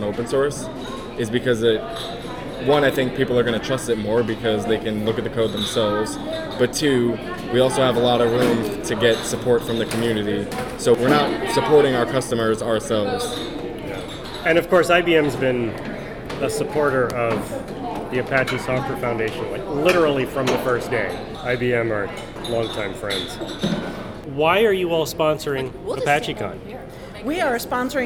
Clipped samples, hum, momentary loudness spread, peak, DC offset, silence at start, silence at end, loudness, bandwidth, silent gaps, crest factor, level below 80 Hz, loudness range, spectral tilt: under 0.1%; none; 13 LU; -4 dBFS; under 0.1%; 0 s; 0 s; -21 LUFS; 18.5 kHz; none; 18 dB; -44 dBFS; 4 LU; -5 dB/octave